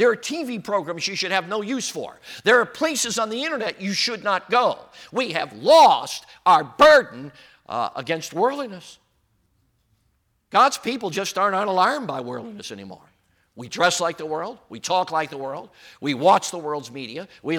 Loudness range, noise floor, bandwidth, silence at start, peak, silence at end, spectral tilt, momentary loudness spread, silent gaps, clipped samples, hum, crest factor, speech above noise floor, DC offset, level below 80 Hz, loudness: 8 LU; -68 dBFS; 18 kHz; 0 s; -4 dBFS; 0 s; -3 dB/octave; 18 LU; none; under 0.1%; none; 18 dB; 46 dB; under 0.1%; -64 dBFS; -21 LUFS